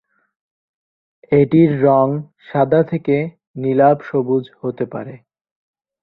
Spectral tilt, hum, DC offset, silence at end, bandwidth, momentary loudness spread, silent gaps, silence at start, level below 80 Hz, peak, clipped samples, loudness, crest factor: -11.5 dB/octave; none; under 0.1%; 0.85 s; 4.6 kHz; 14 LU; 3.47-3.54 s; 1.3 s; -58 dBFS; -2 dBFS; under 0.1%; -17 LUFS; 16 dB